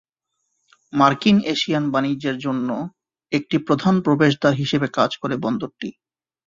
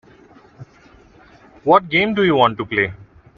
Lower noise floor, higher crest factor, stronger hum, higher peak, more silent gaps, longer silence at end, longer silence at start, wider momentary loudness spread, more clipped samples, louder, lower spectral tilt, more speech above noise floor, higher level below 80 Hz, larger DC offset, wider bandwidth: first, -76 dBFS vs -49 dBFS; about the same, 20 dB vs 20 dB; neither; about the same, -2 dBFS vs 0 dBFS; neither; first, 0.55 s vs 0.35 s; first, 0.95 s vs 0.6 s; first, 11 LU vs 8 LU; neither; second, -20 LUFS vs -17 LUFS; second, -6 dB/octave vs -7.5 dB/octave; first, 56 dB vs 33 dB; second, -58 dBFS vs -52 dBFS; neither; first, 7.6 kHz vs 6.8 kHz